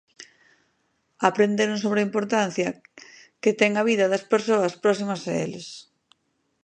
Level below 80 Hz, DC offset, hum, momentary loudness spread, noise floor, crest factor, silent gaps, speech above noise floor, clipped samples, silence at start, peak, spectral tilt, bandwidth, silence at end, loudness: -72 dBFS; under 0.1%; none; 10 LU; -72 dBFS; 22 dB; none; 50 dB; under 0.1%; 0.2 s; -2 dBFS; -5 dB/octave; 9.6 kHz; 0.85 s; -23 LUFS